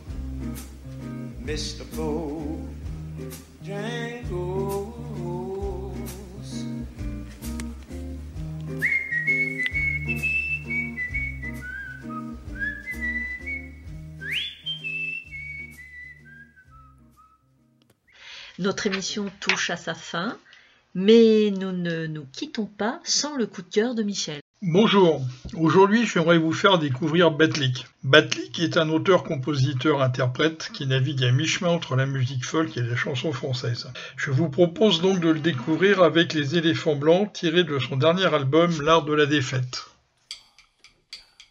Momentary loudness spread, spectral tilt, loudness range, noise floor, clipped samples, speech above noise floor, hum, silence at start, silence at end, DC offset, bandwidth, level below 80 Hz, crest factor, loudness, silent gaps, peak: 17 LU; -5 dB/octave; 12 LU; -62 dBFS; under 0.1%; 40 dB; none; 0 s; 0.3 s; under 0.1%; 15.5 kHz; -44 dBFS; 24 dB; -23 LUFS; 24.41-24.54 s; 0 dBFS